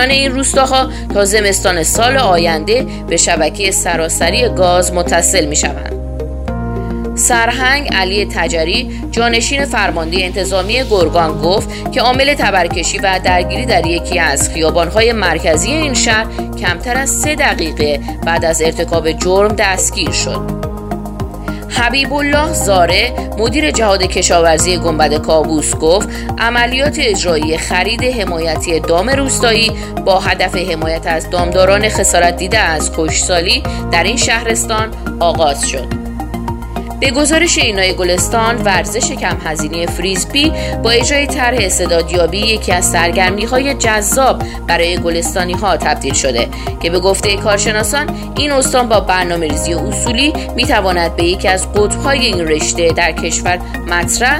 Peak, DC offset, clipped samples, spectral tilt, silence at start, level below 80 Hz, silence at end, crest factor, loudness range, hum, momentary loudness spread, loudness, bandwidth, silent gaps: 0 dBFS; under 0.1%; under 0.1%; -3 dB/octave; 0 s; -24 dBFS; 0 s; 12 dB; 2 LU; none; 7 LU; -13 LUFS; 16.5 kHz; none